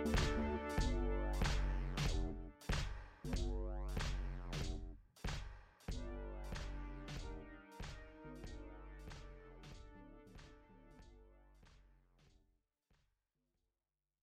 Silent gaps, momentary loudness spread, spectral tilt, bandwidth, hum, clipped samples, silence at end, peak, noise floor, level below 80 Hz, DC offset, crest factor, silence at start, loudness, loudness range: none; 20 LU; -5.5 dB/octave; 14 kHz; none; under 0.1%; 2.3 s; -26 dBFS; under -90 dBFS; -46 dBFS; under 0.1%; 18 dB; 0 s; -45 LUFS; 20 LU